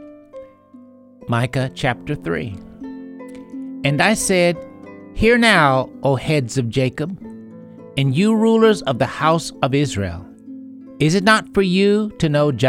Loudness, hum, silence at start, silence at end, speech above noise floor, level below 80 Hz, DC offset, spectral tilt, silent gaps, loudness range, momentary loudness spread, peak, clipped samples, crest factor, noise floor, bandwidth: -17 LUFS; none; 0 s; 0 s; 28 dB; -42 dBFS; under 0.1%; -5.5 dB/octave; none; 7 LU; 23 LU; 0 dBFS; under 0.1%; 18 dB; -45 dBFS; 16 kHz